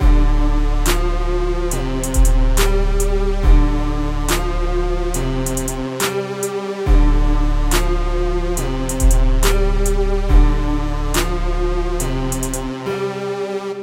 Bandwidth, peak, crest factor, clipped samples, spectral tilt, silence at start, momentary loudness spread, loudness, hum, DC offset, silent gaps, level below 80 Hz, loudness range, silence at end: 16 kHz; 0 dBFS; 14 dB; under 0.1%; -5 dB/octave; 0 s; 6 LU; -20 LUFS; none; under 0.1%; none; -16 dBFS; 2 LU; 0 s